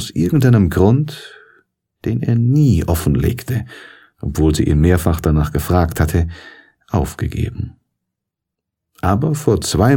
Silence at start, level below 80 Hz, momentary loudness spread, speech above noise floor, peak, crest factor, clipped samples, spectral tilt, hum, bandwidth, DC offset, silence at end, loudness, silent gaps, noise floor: 0 s; -28 dBFS; 12 LU; 66 dB; 0 dBFS; 16 dB; under 0.1%; -7 dB/octave; none; 17.5 kHz; under 0.1%; 0 s; -16 LUFS; none; -81 dBFS